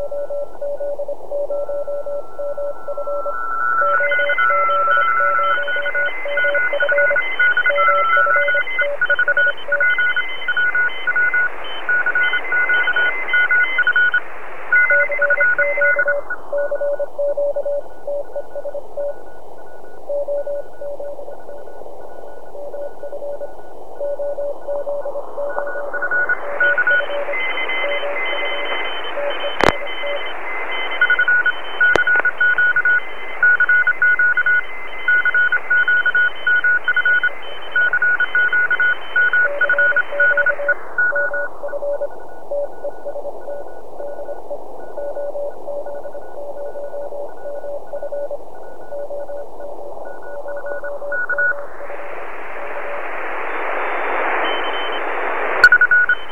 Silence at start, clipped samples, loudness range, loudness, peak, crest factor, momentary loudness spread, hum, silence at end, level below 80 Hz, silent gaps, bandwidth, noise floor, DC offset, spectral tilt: 0 s; under 0.1%; 14 LU; -17 LUFS; 0 dBFS; 20 dB; 17 LU; none; 0 s; -50 dBFS; none; 11 kHz; -39 dBFS; 7%; -3.5 dB/octave